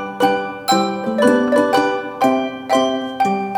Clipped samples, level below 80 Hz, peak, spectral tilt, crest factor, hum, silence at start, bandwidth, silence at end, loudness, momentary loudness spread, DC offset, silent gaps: under 0.1%; -58 dBFS; 0 dBFS; -4.5 dB/octave; 16 dB; none; 0 s; 18 kHz; 0 s; -17 LUFS; 6 LU; under 0.1%; none